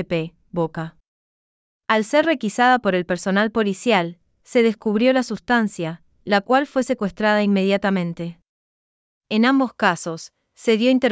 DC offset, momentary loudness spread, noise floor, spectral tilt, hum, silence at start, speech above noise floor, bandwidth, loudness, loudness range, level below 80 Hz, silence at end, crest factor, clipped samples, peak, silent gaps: under 0.1%; 13 LU; under -90 dBFS; -5.5 dB/octave; none; 0 s; over 71 dB; 8 kHz; -20 LUFS; 2 LU; -58 dBFS; 0 s; 18 dB; under 0.1%; -2 dBFS; 1.08-1.80 s, 8.49-9.21 s